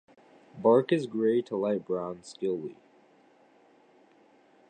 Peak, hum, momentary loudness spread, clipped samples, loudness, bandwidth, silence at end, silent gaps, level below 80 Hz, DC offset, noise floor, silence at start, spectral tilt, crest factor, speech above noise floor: -10 dBFS; none; 12 LU; under 0.1%; -28 LUFS; 9.4 kHz; 1.95 s; none; -76 dBFS; under 0.1%; -61 dBFS; 0.55 s; -7 dB/octave; 20 dB; 34 dB